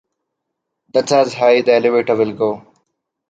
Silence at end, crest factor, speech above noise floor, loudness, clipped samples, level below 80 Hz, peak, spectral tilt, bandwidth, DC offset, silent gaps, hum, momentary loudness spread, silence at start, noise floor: 0.7 s; 16 dB; 63 dB; -15 LUFS; under 0.1%; -64 dBFS; -2 dBFS; -4.5 dB/octave; 9.2 kHz; under 0.1%; none; none; 8 LU; 0.95 s; -77 dBFS